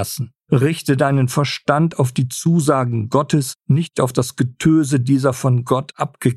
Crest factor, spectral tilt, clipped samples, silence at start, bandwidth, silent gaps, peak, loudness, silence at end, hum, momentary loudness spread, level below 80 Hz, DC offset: 16 dB; -6.5 dB/octave; under 0.1%; 0 s; 13 kHz; none; -2 dBFS; -18 LUFS; 0 s; none; 4 LU; -52 dBFS; under 0.1%